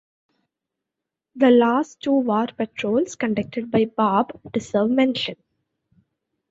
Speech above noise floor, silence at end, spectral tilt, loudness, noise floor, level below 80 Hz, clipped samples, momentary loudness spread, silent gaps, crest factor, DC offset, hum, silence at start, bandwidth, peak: 65 dB; 1.15 s; -5.5 dB/octave; -21 LUFS; -85 dBFS; -62 dBFS; under 0.1%; 10 LU; none; 18 dB; under 0.1%; none; 1.35 s; 8 kHz; -4 dBFS